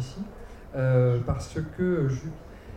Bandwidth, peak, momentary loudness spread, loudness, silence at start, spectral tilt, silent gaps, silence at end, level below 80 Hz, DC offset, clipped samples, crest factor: 9.2 kHz; -12 dBFS; 18 LU; -27 LUFS; 0 s; -8 dB/octave; none; 0 s; -44 dBFS; under 0.1%; under 0.1%; 16 dB